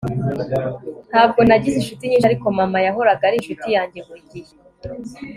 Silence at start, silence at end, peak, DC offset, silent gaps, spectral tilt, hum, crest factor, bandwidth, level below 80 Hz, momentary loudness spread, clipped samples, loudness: 0 s; 0 s; 0 dBFS; under 0.1%; none; -6.5 dB/octave; none; 18 dB; 14.5 kHz; -48 dBFS; 23 LU; under 0.1%; -17 LUFS